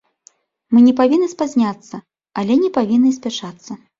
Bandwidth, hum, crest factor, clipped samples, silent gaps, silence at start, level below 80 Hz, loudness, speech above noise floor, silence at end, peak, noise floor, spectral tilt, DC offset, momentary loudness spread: 7.6 kHz; none; 16 dB; under 0.1%; none; 0.7 s; -60 dBFS; -16 LUFS; 38 dB; 0.25 s; -2 dBFS; -53 dBFS; -6 dB/octave; under 0.1%; 20 LU